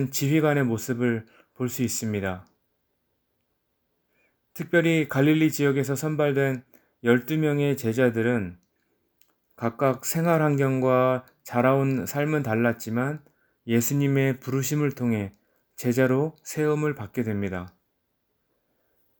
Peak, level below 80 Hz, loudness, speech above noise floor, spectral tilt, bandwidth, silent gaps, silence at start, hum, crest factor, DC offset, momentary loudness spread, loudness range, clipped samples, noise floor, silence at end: -6 dBFS; -66 dBFS; -25 LUFS; 51 dB; -6 dB/octave; over 20 kHz; none; 0 s; none; 20 dB; under 0.1%; 10 LU; 6 LU; under 0.1%; -75 dBFS; 1.5 s